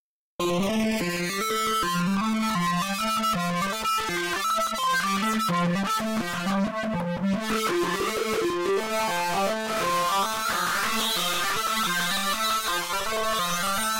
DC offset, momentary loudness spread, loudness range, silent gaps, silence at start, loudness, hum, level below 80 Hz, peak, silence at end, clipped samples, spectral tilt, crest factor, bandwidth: under 0.1%; 3 LU; 2 LU; none; 0.4 s; -25 LUFS; none; -54 dBFS; -18 dBFS; 0 s; under 0.1%; -3.5 dB/octave; 8 dB; 16 kHz